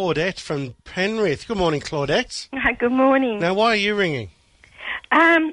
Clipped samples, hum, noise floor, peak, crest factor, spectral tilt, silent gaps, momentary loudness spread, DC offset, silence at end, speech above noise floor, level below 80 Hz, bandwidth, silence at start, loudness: under 0.1%; none; -43 dBFS; -4 dBFS; 16 dB; -5 dB/octave; none; 13 LU; under 0.1%; 0 s; 23 dB; -48 dBFS; 11.5 kHz; 0 s; -20 LUFS